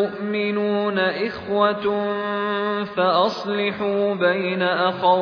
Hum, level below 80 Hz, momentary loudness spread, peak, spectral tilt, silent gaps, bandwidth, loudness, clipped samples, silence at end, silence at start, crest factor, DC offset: none; -62 dBFS; 5 LU; -4 dBFS; -6.5 dB/octave; none; 5.4 kHz; -21 LUFS; under 0.1%; 0 s; 0 s; 16 dB; under 0.1%